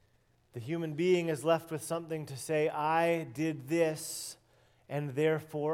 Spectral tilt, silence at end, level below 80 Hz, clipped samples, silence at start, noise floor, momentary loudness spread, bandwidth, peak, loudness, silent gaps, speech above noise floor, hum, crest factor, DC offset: -5.5 dB/octave; 0 s; -76 dBFS; under 0.1%; 0.55 s; -69 dBFS; 11 LU; 16.5 kHz; -16 dBFS; -33 LUFS; none; 37 dB; none; 18 dB; under 0.1%